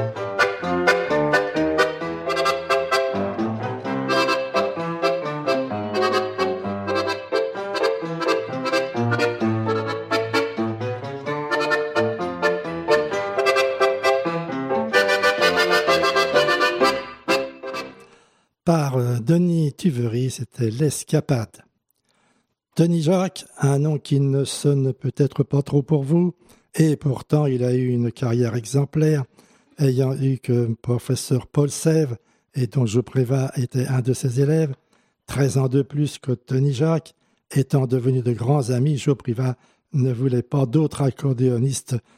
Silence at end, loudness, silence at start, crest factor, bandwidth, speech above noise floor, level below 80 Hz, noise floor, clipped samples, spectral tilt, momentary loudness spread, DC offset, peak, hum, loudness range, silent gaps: 0.15 s; -21 LUFS; 0 s; 16 dB; 15 kHz; 48 dB; -58 dBFS; -68 dBFS; under 0.1%; -6 dB/octave; 7 LU; under 0.1%; -4 dBFS; none; 4 LU; none